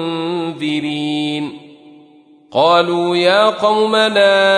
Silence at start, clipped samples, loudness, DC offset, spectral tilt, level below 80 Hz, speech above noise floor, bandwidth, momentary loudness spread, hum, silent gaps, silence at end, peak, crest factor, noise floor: 0 s; under 0.1%; -15 LUFS; under 0.1%; -4.5 dB/octave; -66 dBFS; 33 dB; 11 kHz; 10 LU; none; none; 0 s; -2 dBFS; 14 dB; -46 dBFS